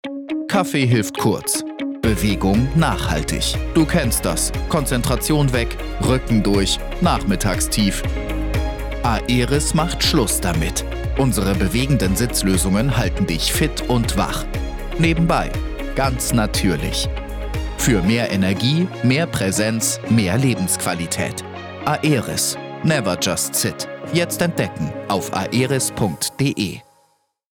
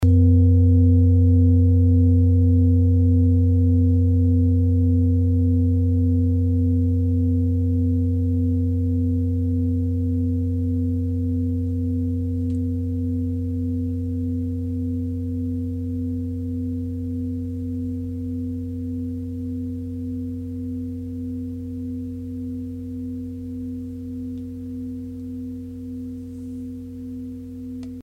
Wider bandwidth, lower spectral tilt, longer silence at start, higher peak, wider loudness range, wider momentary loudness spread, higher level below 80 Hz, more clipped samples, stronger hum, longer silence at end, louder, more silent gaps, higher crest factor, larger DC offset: first, 18.5 kHz vs 0.8 kHz; second, -4.5 dB/octave vs -12 dB/octave; about the same, 0.05 s vs 0 s; first, -4 dBFS vs -8 dBFS; second, 2 LU vs 14 LU; second, 7 LU vs 16 LU; first, -28 dBFS vs -36 dBFS; neither; neither; first, 0.75 s vs 0 s; first, -19 LUFS vs -22 LUFS; neither; about the same, 16 dB vs 14 dB; neither